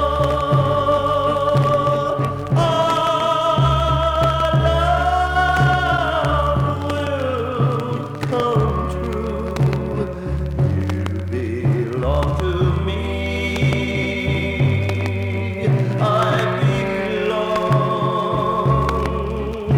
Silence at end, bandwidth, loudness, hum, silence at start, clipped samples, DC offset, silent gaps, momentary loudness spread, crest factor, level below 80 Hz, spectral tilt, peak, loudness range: 0 s; 12.5 kHz; -19 LUFS; none; 0 s; under 0.1%; under 0.1%; none; 7 LU; 14 dB; -30 dBFS; -7 dB/octave; -4 dBFS; 4 LU